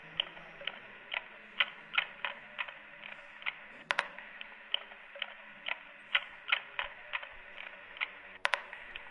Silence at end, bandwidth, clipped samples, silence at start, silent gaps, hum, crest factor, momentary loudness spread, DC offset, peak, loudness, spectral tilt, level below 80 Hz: 0 s; 10.5 kHz; under 0.1%; 0 s; none; none; 34 dB; 13 LU; under 0.1%; -6 dBFS; -38 LUFS; -1 dB/octave; -70 dBFS